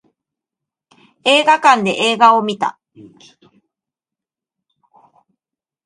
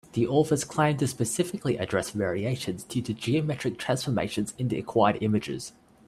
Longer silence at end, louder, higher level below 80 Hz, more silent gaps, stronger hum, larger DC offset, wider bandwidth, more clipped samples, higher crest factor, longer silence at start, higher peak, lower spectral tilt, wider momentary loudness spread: first, 3.15 s vs 0.4 s; first, -13 LUFS vs -27 LUFS; second, -70 dBFS vs -60 dBFS; neither; neither; neither; second, 11.5 kHz vs 15 kHz; neither; about the same, 18 dB vs 20 dB; first, 1.25 s vs 0.15 s; first, 0 dBFS vs -8 dBFS; second, -3 dB/octave vs -5.5 dB/octave; about the same, 10 LU vs 8 LU